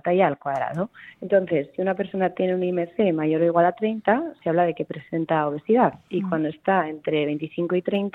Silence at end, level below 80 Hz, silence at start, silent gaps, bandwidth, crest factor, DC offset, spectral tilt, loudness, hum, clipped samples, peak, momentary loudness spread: 0.05 s; -66 dBFS; 0.05 s; none; 4.1 kHz; 16 dB; under 0.1%; -9 dB/octave; -23 LUFS; none; under 0.1%; -6 dBFS; 7 LU